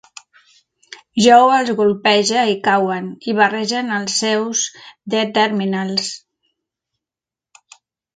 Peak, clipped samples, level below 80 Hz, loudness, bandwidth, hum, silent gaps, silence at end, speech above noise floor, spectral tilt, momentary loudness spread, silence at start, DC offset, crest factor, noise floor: 0 dBFS; under 0.1%; -64 dBFS; -16 LUFS; 9.6 kHz; none; none; 2 s; 73 dB; -3 dB/octave; 13 LU; 0.9 s; under 0.1%; 18 dB; -89 dBFS